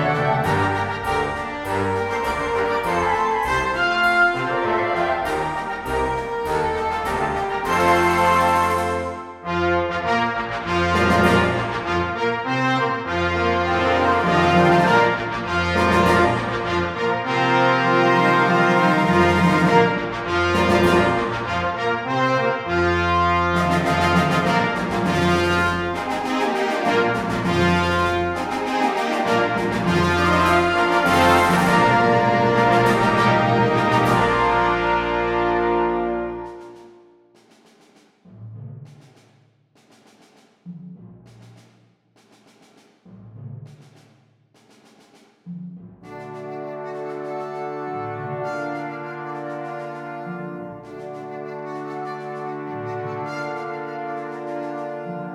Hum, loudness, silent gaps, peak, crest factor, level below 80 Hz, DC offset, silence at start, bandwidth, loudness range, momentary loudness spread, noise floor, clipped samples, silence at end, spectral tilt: none; -20 LUFS; none; -2 dBFS; 18 dB; -44 dBFS; under 0.1%; 0 s; 16 kHz; 14 LU; 15 LU; -58 dBFS; under 0.1%; 0 s; -5.5 dB/octave